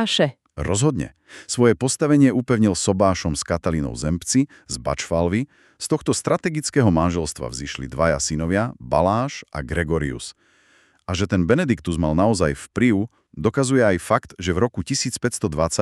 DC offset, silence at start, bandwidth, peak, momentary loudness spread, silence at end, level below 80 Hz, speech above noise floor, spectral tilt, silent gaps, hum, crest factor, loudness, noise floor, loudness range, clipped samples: under 0.1%; 0 s; 13 kHz; -2 dBFS; 11 LU; 0 s; -40 dBFS; 37 dB; -5 dB/octave; none; none; 18 dB; -21 LUFS; -58 dBFS; 4 LU; under 0.1%